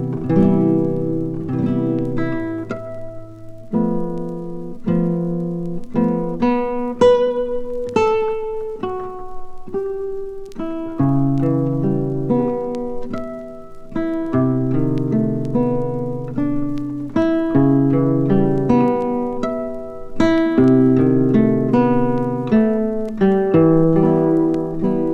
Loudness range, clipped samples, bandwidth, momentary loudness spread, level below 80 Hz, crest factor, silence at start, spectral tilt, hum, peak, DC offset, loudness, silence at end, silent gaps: 7 LU; under 0.1%; 8.4 kHz; 14 LU; -38 dBFS; 16 dB; 0 s; -9.5 dB/octave; none; -2 dBFS; under 0.1%; -18 LUFS; 0 s; none